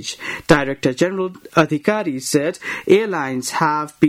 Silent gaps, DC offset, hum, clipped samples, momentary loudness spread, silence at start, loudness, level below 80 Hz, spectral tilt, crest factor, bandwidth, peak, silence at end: none; under 0.1%; none; under 0.1%; 8 LU; 0 s; -19 LUFS; -48 dBFS; -5 dB/octave; 18 dB; 16 kHz; -2 dBFS; 0 s